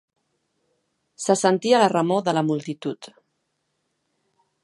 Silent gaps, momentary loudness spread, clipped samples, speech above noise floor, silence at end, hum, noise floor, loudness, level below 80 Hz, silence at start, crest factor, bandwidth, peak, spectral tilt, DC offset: none; 13 LU; under 0.1%; 54 dB; 1.55 s; none; -74 dBFS; -21 LUFS; -76 dBFS; 1.2 s; 20 dB; 11.5 kHz; -4 dBFS; -5 dB/octave; under 0.1%